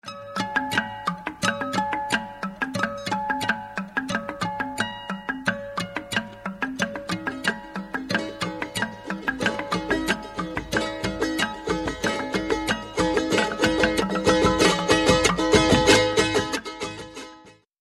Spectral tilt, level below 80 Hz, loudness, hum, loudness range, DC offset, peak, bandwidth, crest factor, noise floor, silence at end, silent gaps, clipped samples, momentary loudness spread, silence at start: -4 dB/octave; -44 dBFS; -24 LUFS; none; 9 LU; under 0.1%; -4 dBFS; 15 kHz; 22 dB; -50 dBFS; 0.3 s; none; under 0.1%; 12 LU; 0.05 s